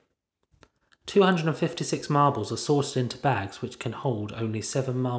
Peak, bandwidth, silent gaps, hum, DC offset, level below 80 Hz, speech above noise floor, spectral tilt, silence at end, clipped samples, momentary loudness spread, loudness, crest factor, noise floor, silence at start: -6 dBFS; 8 kHz; none; none; under 0.1%; -60 dBFS; 50 dB; -5.5 dB/octave; 0 s; under 0.1%; 9 LU; -26 LUFS; 20 dB; -76 dBFS; 1.05 s